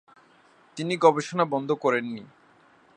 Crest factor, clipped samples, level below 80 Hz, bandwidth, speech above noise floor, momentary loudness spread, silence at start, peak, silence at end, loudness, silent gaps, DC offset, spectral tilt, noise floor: 22 dB; under 0.1%; -78 dBFS; 9.6 kHz; 34 dB; 17 LU; 0.75 s; -4 dBFS; 0.7 s; -24 LUFS; none; under 0.1%; -5.5 dB/octave; -58 dBFS